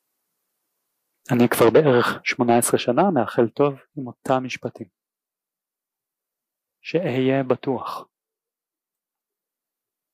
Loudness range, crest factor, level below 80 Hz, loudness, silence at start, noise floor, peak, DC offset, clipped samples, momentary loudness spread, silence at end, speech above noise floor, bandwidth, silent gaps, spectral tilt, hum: 9 LU; 18 dB; -66 dBFS; -20 LUFS; 1.3 s; -89 dBFS; -6 dBFS; under 0.1%; under 0.1%; 17 LU; 2.1 s; 69 dB; 15.5 kHz; none; -5.5 dB/octave; none